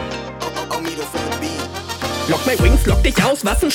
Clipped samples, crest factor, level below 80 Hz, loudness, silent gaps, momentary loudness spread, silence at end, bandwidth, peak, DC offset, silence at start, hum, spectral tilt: under 0.1%; 16 dB; -22 dBFS; -19 LUFS; none; 11 LU; 0 s; 18.5 kHz; 0 dBFS; under 0.1%; 0 s; none; -4.5 dB/octave